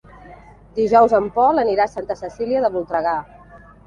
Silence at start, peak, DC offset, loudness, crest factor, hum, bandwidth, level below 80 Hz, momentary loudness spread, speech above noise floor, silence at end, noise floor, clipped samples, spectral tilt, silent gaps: 0.25 s; -2 dBFS; under 0.1%; -18 LUFS; 18 dB; none; 7.4 kHz; -50 dBFS; 13 LU; 27 dB; 0.3 s; -44 dBFS; under 0.1%; -6.5 dB/octave; none